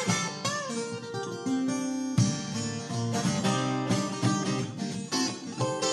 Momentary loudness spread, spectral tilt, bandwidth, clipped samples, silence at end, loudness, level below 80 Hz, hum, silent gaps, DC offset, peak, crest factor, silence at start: 7 LU; -4.5 dB/octave; 13 kHz; under 0.1%; 0 s; -30 LUFS; -62 dBFS; none; none; under 0.1%; -12 dBFS; 18 dB; 0 s